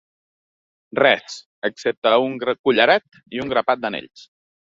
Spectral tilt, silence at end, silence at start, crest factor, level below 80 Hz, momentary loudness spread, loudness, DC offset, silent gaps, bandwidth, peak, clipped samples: -4 dB/octave; 0.75 s; 0.95 s; 20 dB; -62 dBFS; 13 LU; -19 LUFS; under 0.1%; 1.46-1.62 s, 1.97-2.02 s, 2.59-2.64 s; 7.8 kHz; -2 dBFS; under 0.1%